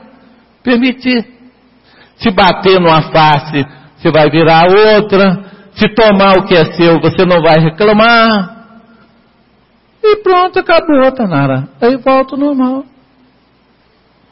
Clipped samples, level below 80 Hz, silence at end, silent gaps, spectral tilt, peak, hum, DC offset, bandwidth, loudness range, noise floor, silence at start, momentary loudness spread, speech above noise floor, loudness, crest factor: under 0.1%; -40 dBFS; 1.5 s; none; -9 dB/octave; 0 dBFS; none; under 0.1%; 5.8 kHz; 4 LU; -50 dBFS; 0.65 s; 10 LU; 42 dB; -9 LUFS; 10 dB